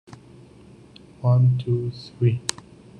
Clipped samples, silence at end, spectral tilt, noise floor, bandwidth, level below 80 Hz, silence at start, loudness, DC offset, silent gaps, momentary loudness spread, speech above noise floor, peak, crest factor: under 0.1%; 0.5 s; -6.5 dB/octave; -48 dBFS; 10.5 kHz; -56 dBFS; 1.2 s; -23 LUFS; under 0.1%; none; 11 LU; 28 dB; -2 dBFS; 22 dB